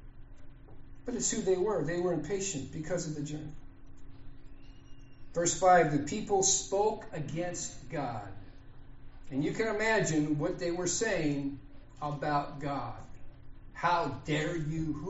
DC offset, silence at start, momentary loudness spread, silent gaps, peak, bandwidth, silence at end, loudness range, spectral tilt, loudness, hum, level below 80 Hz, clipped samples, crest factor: under 0.1%; 0 s; 14 LU; none; -12 dBFS; 8 kHz; 0 s; 7 LU; -4.5 dB/octave; -31 LUFS; none; -50 dBFS; under 0.1%; 20 dB